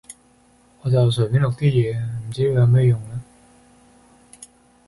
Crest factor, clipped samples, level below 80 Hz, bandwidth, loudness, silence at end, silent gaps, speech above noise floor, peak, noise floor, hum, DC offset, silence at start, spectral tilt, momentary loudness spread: 14 dB; under 0.1%; -48 dBFS; 11.5 kHz; -19 LUFS; 1.65 s; none; 38 dB; -6 dBFS; -55 dBFS; none; under 0.1%; 0.1 s; -7.5 dB/octave; 13 LU